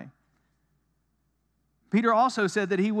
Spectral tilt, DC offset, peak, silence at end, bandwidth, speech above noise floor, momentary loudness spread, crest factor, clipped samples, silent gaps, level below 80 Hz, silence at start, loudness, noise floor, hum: -6 dB/octave; under 0.1%; -10 dBFS; 0 s; 11 kHz; 49 dB; 4 LU; 18 dB; under 0.1%; none; -76 dBFS; 0 s; -25 LUFS; -73 dBFS; none